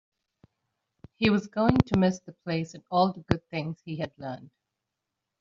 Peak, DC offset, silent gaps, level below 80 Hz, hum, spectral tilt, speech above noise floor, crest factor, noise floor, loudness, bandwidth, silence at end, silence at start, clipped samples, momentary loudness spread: -4 dBFS; under 0.1%; none; -52 dBFS; none; -6 dB/octave; 58 dB; 26 dB; -85 dBFS; -28 LUFS; 7.4 kHz; 0.95 s; 1.2 s; under 0.1%; 13 LU